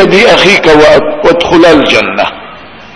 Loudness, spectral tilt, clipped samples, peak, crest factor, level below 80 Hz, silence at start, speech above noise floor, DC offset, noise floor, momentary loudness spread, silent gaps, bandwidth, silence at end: -5 LUFS; -4.5 dB/octave; 8%; 0 dBFS; 6 dB; -32 dBFS; 0 s; 24 dB; under 0.1%; -29 dBFS; 9 LU; none; 11 kHz; 0.1 s